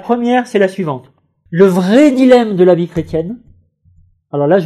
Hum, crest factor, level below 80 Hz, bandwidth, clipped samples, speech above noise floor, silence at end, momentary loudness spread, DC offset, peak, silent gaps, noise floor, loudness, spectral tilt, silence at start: none; 12 dB; -46 dBFS; 13.5 kHz; 0.2%; 39 dB; 0 s; 14 LU; under 0.1%; 0 dBFS; none; -50 dBFS; -12 LUFS; -7 dB/octave; 0.05 s